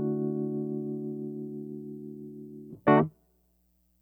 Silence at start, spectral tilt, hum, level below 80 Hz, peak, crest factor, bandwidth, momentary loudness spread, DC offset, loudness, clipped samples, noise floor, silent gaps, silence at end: 0 s; -10 dB/octave; none; -70 dBFS; -8 dBFS; 22 dB; 15.5 kHz; 20 LU; under 0.1%; -30 LUFS; under 0.1%; -69 dBFS; none; 0.9 s